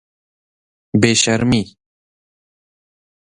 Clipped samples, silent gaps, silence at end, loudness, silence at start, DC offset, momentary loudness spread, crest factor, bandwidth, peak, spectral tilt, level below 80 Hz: under 0.1%; none; 1.55 s; -15 LUFS; 0.95 s; under 0.1%; 8 LU; 20 dB; 11 kHz; 0 dBFS; -4 dB/octave; -48 dBFS